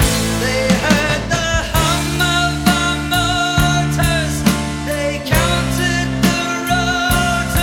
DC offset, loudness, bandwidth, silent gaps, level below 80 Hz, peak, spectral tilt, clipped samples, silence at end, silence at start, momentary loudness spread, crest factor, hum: under 0.1%; -16 LUFS; 17.5 kHz; none; -26 dBFS; 0 dBFS; -4 dB/octave; under 0.1%; 0 s; 0 s; 3 LU; 16 dB; none